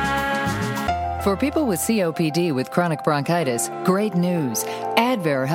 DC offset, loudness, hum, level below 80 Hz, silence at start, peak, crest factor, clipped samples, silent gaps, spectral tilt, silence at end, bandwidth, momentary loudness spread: under 0.1%; -22 LUFS; none; -44 dBFS; 0 s; -2 dBFS; 20 dB; under 0.1%; none; -5 dB/octave; 0 s; 17.5 kHz; 3 LU